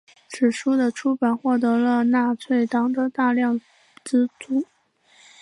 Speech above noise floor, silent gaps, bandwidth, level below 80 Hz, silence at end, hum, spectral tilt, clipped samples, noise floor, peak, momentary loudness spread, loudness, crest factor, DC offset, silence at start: 38 dB; none; 11 kHz; -76 dBFS; 0.75 s; none; -5 dB/octave; under 0.1%; -58 dBFS; -8 dBFS; 7 LU; -22 LUFS; 14 dB; under 0.1%; 0.3 s